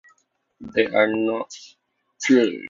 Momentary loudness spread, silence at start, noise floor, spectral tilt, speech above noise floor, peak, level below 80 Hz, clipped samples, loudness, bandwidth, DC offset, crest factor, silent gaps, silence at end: 19 LU; 0.6 s; -64 dBFS; -4 dB/octave; 44 dB; -4 dBFS; -64 dBFS; under 0.1%; -21 LUFS; 7.6 kHz; under 0.1%; 18 dB; none; 0 s